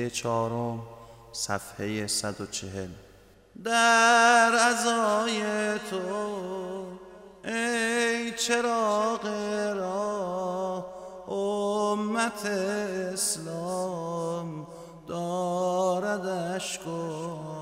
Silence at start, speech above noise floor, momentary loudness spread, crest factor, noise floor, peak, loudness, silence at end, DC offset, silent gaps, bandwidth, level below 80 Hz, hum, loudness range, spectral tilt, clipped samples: 0 s; 27 dB; 16 LU; 20 dB; -55 dBFS; -8 dBFS; -27 LUFS; 0 s; under 0.1%; none; 16 kHz; -64 dBFS; none; 8 LU; -3 dB/octave; under 0.1%